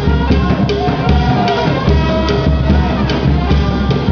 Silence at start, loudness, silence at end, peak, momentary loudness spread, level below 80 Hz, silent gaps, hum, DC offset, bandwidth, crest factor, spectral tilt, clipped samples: 0 s; -13 LUFS; 0 s; 0 dBFS; 2 LU; -18 dBFS; none; none; under 0.1%; 5.4 kHz; 12 dB; -7.5 dB/octave; under 0.1%